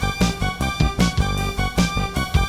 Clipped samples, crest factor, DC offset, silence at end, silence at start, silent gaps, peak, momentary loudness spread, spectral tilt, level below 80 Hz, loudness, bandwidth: under 0.1%; 16 dB; under 0.1%; 0 s; 0 s; none; -4 dBFS; 4 LU; -5 dB/octave; -26 dBFS; -21 LUFS; 15.5 kHz